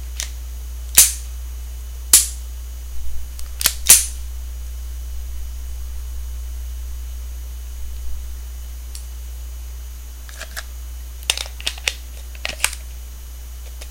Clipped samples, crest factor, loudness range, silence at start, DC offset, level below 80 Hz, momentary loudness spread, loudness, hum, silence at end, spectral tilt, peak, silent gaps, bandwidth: under 0.1%; 24 dB; 16 LU; 0 s; under 0.1%; -30 dBFS; 22 LU; -16 LUFS; none; 0 s; 0 dB/octave; 0 dBFS; none; 17 kHz